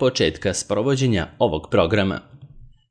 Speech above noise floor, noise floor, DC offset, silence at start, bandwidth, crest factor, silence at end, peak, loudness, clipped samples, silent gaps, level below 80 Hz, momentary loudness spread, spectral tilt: 24 dB; -44 dBFS; under 0.1%; 0 s; 10.5 kHz; 16 dB; 0.25 s; -4 dBFS; -21 LUFS; under 0.1%; none; -44 dBFS; 5 LU; -5 dB/octave